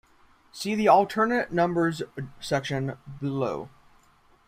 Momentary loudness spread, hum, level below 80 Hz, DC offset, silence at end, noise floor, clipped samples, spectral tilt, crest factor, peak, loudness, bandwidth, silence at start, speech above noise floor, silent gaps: 17 LU; none; -60 dBFS; under 0.1%; 0.8 s; -60 dBFS; under 0.1%; -6 dB/octave; 20 dB; -6 dBFS; -26 LUFS; 16 kHz; 0.55 s; 35 dB; none